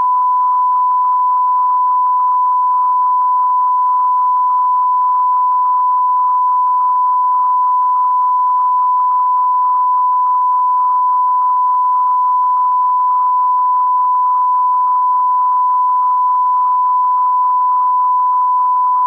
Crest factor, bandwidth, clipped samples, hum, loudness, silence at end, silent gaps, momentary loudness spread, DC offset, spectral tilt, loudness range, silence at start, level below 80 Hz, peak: 4 dB; 1.9 kHz; under 0.1%; none; -13 LUFS; 0 s; none; 0 LU; under 0.1%; -1.5 dB/octave; 0 LU; 0 s; -82 dBFS; -8 dBFS